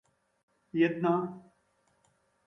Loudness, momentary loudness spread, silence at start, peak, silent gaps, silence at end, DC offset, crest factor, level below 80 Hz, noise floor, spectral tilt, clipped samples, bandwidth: -30 LUFS; 15 LU; 0.75 s; -16 dBFS; none; 1.05 s; under 0.1%; 18 dB; -78 dBFS; -72 dBFS; -8.5 dB/octave; under 0.1%; 6 kHz